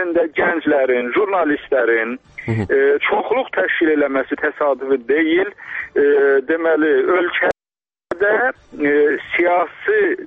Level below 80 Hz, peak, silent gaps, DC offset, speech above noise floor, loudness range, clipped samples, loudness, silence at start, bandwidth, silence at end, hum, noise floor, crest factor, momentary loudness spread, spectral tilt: -54 dBFS; -6 dBFS; none; under 0.1%; over 73 dB; 1 LU; under 0.1%; -17 LUFS; 0 s; 4.7 kHz; 0 s; none; under -90 dBFS; 12 dB; 6 LU; -7.5 dB/octave